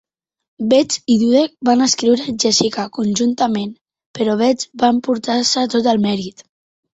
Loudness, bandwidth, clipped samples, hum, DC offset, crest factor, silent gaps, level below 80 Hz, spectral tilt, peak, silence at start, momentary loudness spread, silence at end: -16 LUFS; 8.2 kHz; under 0.1%; none; under 0.1%; 16 dB; 3.81-3.85 s, 4.06-4.14 s; -58 dBFS; -4 dB/octave; -2 dBFS; 0.6 s; 8 LU; 0.55 s